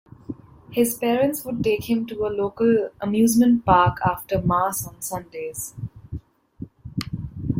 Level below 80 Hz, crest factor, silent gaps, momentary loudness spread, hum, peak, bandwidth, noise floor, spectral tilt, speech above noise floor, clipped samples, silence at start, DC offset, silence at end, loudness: -46 dBFS; 20 dB; none; 21 LU; none; -2 dBFS; 16.5 kHz; -41 dBFS; -5.5 dB/octave; 20 dB; under 0.1%; 0.3 s; under 0.1%; 0 s; -22 LUFS